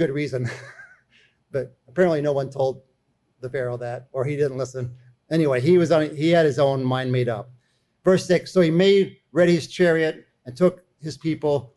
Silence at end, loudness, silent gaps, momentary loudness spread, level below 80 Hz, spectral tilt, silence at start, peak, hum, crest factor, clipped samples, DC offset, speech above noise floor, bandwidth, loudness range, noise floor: 0.1 s; -22 LUFS; none; 15 LU; -60 dBFS; -6.5 dB/octave; 0 s; -8 dBFS; none; 14 dB; under 0.1%; under 0.1%; 48 dB; 12 kHz; 6 LU; -69 dBFS